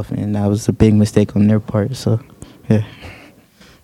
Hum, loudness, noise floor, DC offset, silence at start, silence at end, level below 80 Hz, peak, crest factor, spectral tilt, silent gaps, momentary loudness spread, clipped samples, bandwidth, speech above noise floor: none; -16 LUFS; -47 dBFS; under 0.1%; 0 s; 0.7 s; -40 dBFS; 0 dBFS; 16 dB; -7.5 dB/octave; none; 11 LU; under 0.1%; 13 kHz; 31 dB